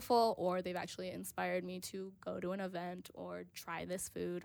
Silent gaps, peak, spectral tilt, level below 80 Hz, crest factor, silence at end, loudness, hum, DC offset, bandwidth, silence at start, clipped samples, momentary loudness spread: none; -20 dBFS; -4.5 dB/octave; -74 dBFS; 18 dB; 0 s; -41 LUFS; none; under 0.1%; over 20 kHz; 0 s; under 0.1%; 12 LU